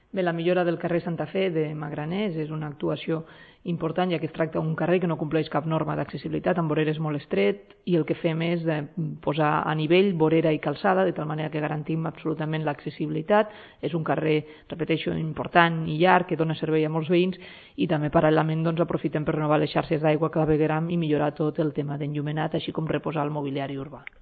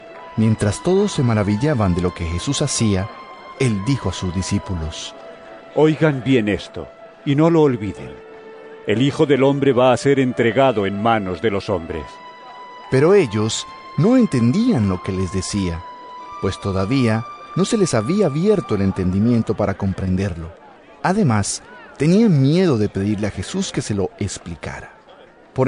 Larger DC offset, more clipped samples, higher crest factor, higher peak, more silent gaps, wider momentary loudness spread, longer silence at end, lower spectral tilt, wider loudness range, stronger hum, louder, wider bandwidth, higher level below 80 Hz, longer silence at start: neither; neither; first, 22 dB vs 16 dB; about the same, -4 dBFS vs -4 dBFS; neither; second, 9 LU vs 18 LU; first, 0.2 s vs 0 s; first, -11 dB/octave vs -6 dB/octave; about the same, 4 LU vs 4 LU; neither; second, -25 LUFS vs -19 LUFS; second, 4.8 kHz vs 11 kHz; second, -56 dBFS vs -46 dBFS; first, 0.15 s vs 0 s